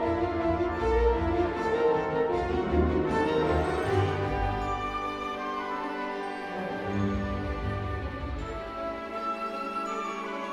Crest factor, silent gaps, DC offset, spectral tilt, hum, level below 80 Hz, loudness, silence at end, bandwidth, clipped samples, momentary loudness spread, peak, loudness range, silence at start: 16 dB; none; under 0.1%; -7 dB/octave; none; -38 dBFS; -29 LUFS; 0 s; 12 kHz; under 0.1%; 9 LU; -12 dBFS; 6 LU; 0 s